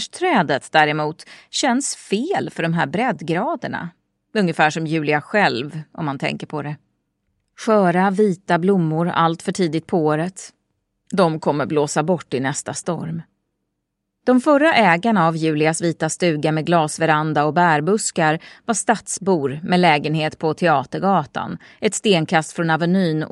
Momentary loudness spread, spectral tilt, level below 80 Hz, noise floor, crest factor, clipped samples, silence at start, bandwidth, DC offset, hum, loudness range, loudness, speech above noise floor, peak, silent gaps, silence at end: 11 LU; -5 dB/octave; -64 dBFS; -76 dBFS; 18 dB; under 0.1%; 0 s; 12 kHz; under 0.1%; none; 4 LU; -19 LUFS; 58 dB; 0 dBFS; none; 0.05 s